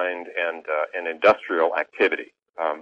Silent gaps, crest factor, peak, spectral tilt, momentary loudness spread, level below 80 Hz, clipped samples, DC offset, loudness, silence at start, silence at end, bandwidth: none; 20 dB; -4 dBFS; -4.5 dB/octave; 9 LU; -68 dBFS; under 0.1%; under 0.1%; -23 LUFS; 0 s; 0 s; 7.6 kHz